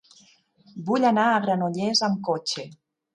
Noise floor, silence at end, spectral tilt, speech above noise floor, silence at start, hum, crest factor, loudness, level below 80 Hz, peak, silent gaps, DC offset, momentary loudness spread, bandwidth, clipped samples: -58 dBFS; 0.4 s; -4.5 dB/octave; 35 dB; 0.75 s; none; 16 dB; -23 LUFS; -74 dBFS; -8 dBFS; none; under 0.1%; 15 LU; 11 kHz; under 0.1%